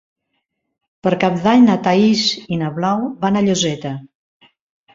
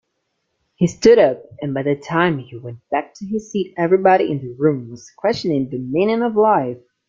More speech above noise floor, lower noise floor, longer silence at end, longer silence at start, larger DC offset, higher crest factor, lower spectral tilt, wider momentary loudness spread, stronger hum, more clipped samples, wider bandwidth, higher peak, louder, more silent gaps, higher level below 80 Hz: about the same, 57 dB vs 55 dB; about the same, -73 dBFS vs -72 dBFS; first, 0.9 s vs 0.3 s; first, 1.05 s vs 0.8 s; neither; about the same, 16 dB vs 16 dB; second, -5 dB/octave vs -6.5 dB/octave; about the same, 11 LU vs 13 LU; neither; neither; about the same, 7.8 kHz vs 7.6 kHz; about the same, -2 dBFS vs -2 dBFS; about the same, -16 LUFS vs -18 LUFS; neither; about the same, -56 dBFS vs -56 dBFS